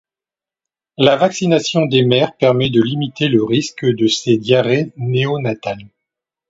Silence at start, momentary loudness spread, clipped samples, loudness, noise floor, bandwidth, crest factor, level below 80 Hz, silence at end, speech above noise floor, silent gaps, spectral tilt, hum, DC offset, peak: 1 s; 6 LU; under 0.1%; -15 LUFS; -89 dBFS; 8 kHz; 16 dB; -54 dBFS; 0.6 s; 74 dB; none; -5.5 dB/octave; none; under 0.1%; 0 dBFS